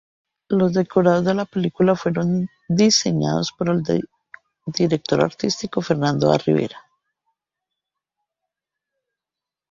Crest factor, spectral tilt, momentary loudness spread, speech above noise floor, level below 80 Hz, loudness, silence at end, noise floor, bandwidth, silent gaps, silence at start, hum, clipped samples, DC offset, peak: 18 dB; -5.5 dB/octave; 7 LU; 69 dB; -58 dBFS; -20 LUFS; 2.95 s; -88 dBFS; 7.8 kHz; none; 0.5 s; none; under 0.1%; under 0.1%; -2 dBFS